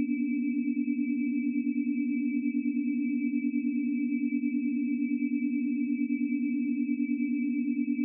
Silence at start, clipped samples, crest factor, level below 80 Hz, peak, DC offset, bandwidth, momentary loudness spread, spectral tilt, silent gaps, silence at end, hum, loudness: 0 s; under 0.1%; 10 dB; under -90 dBFS; -20 dBFS; under 0.1%; 2.8 kHz; 0 LU; -8 dB/octave; none; 0 s; none; -30 LUFS